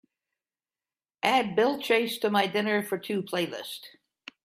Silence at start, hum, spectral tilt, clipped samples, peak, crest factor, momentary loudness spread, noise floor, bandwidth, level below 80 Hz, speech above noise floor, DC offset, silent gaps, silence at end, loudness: 1.25 s; none; -4.5 dB/octave; under 0.1%; -6 dBFS; 24 dB; 10 LU; under -90 dBFS; 16 kHz; -76 dBFS; over 63 dB; under 0.1%; none; 0.55 s; -27 LUFS